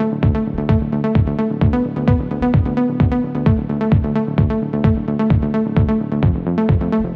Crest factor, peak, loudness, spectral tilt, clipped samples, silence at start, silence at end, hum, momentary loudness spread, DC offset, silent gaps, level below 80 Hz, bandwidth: 12 dB; -4 dBFS; -17 LUFS; -11 dB/octave; under 0.1%; 0 s; 0 s; none; 2 LU; under 0.1%; none; -26 dBFS; 5.2 kHz